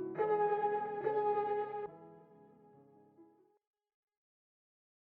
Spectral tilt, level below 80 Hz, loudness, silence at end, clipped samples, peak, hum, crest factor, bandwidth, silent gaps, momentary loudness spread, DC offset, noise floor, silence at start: -5 dB/octave; -84 dBFS; -35 LUFS; 1.75 s; under 0.1%; -22 dBFS; none; 16 dB; 4.3 kHz; none; 13 LU; under 0.1%; -65 dBFS; 0 s